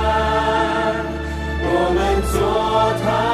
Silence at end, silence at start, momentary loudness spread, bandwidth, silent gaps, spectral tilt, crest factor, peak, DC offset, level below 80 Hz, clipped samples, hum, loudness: 0 s; 0 s; 7 LU; 13.5 kHz; none; -5.5 dB/octave; 12 dB; -6 dBFS; under 0.1%; -28 dBFS; under 0.1%; none; -19 LUFS